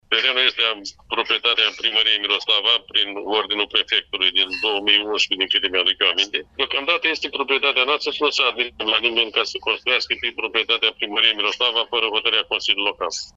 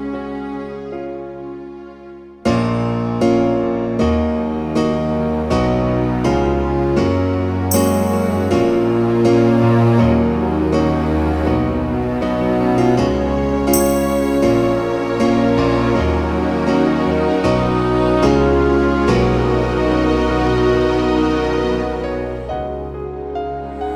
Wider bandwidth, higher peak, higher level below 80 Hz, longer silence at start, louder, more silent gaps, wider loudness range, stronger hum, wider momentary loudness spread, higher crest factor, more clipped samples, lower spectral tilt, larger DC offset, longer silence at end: second, 8 kHz vs over 20 kHz; about the same, -2 dBFS vs -2 dBFS; second, -58 dBFS vs -28 dBFS; about the same, 0.1 s vs 0 s; about the same, -18 LUFS vs -17 LUFS; neither; second, 1 LU vs 4 LU; neither; second, 5 LU vs 12 LU; about the same, 18 dB vs 14 dB; neither; second, -0.5 dB/octave vs -7 dB/octave; neither; about the same, 0.05 s vs 0 s